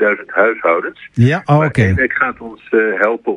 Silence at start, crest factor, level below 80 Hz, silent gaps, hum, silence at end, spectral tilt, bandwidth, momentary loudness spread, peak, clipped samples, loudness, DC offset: 0 s; 14 dB; -44 dBFS; none; none; 0 s; -8 dB/octave; 10.5 kHz; 6 LU; 0 dBFS; under 0.1%; -14 LUFS; under 0.1%